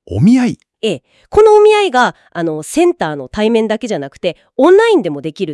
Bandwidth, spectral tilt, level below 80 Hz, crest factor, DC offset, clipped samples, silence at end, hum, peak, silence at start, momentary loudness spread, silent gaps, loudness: 12 kHz; -6 dB/octave; -44 dBFS; 12 dB; under 0.1%; 0.3%; 0 s; none; 0 dBFS; 0.1 s; 13 LU; none; -13 LUFS